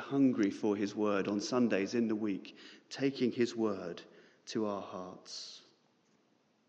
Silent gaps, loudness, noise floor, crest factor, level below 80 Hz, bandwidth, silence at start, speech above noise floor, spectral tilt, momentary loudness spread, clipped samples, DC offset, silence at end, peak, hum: none; -34 LUFS; -72 dBFS; 18 dB; -88 dBFS; 8.4 kHz; 0 s; 38 dB; -5.5 dB/octave; 17 LU; under 0.1%; under 0.1%; 1.1 s; -18 dBFS; none